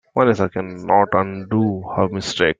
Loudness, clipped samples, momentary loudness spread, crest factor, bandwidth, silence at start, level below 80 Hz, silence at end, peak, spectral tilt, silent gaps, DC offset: -19 LUFS; under 0.1%; 6 LU; 16 dB; 9.4 kHz; 0.15 s; -54 dBFS; 0.05 s; -2 dBFS; -6 dB/octave; none; under 0.1%